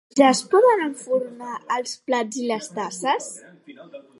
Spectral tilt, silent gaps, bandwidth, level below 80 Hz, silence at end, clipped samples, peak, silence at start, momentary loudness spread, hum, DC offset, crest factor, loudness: -3 dB/octave; none; 11.5 kHz; -78 dBFS; 0.2 s; under 0.1%; -2 dBFS; 0.15 s; 18 LU; none; under 0.1%; 20 dB; -22 LUFS